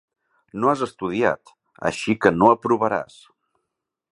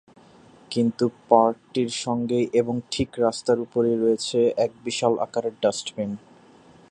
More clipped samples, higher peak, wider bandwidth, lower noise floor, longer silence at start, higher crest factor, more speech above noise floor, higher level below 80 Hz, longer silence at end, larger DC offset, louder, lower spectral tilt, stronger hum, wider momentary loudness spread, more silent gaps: neither; about the same, 0 dBFS vs -2 dBFS; about the same, 11.5 kHz vs 11 kHz; first, -81 dBFS vs -52 dBFS; second, 0.55 s vs 0.7 s; about the same, 22 dB vs 22 dB; first, 60 dB vs 29 dB; about the same, -56 dBFS vs -58 dBFS; first, 1.1 s vs 0.75 s; neither; first, -21 LUFS vs -24 LUFS; about the same, -6 dB/octave vs -5 dB/octave; neither; first, 13 LU vs 9 LU; neither